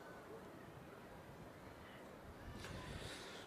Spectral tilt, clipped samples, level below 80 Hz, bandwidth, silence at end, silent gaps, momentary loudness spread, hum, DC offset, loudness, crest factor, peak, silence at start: -4.5 dB/octave; under 0.1%; -66 dBFS; 15 kHz; 0 s; none; 7 LU; none; under 0.1%; -54 LUFS; 18 dB; -36 dBFS; 0 s